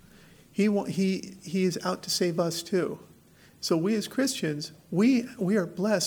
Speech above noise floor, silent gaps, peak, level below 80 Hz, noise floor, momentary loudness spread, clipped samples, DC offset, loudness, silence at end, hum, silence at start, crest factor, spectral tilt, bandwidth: 29 dB; none; -12 dBFS; -68 dBFS; -56 dBFS; 9 LU; under 0.1%; under 0.1%; -28 LUFS; 0 s; none; 0.55 s; 16 dB; -5 dB/octave; 19.5 kHz